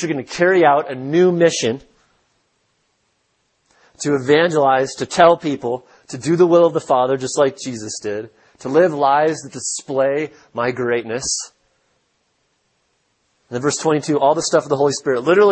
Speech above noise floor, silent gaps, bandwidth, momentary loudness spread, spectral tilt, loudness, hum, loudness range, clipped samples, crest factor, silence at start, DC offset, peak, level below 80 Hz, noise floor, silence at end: 50 dB; none; 8.8 kHz; 13 LU; -4.5 dB/octave; -17 LUFS; none; 7 LU; under 0.1%; 18 dB; 0 s; under 0.1%; 0 dBFS; -60 dBFS; -66 dBFS; 0 s